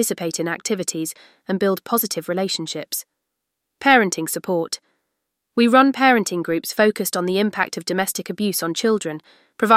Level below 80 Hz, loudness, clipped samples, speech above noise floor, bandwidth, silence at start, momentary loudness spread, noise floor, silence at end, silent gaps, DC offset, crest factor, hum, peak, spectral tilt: -68 dBFS; -20 LUFS; under 0.1%; 59 dB; 16 kHz; 0 s; 13 LU; -79 dBFS; 0 s; none; under 0.1%; 20 dB; none; 0 dBFS; -3.5 dB/octave